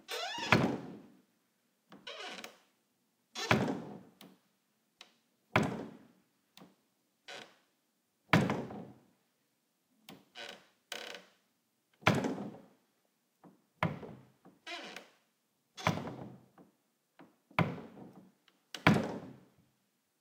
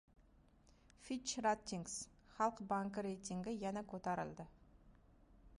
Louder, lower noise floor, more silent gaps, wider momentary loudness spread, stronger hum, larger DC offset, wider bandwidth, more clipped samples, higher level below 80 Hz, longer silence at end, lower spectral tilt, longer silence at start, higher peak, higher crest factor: first, -35 LUFS vs -43 LUFS; first, -79 dBFS vs -69 dBFS; neither; first, 25 LU vs 12 LU; neither; neither; first, 16.5 kHz vs 11 kHz; neither; about the same, -72 dBFS vs -68 dBFS; first, 0.85 s vs 0.05 s; about the same, -5.5 dB/octave vs -4.5 dB/octave; about the same, 0.1 s vs 0.2 s; first, -8 dBFS vs -24 dBFS; first, 32 dB vs 20 dB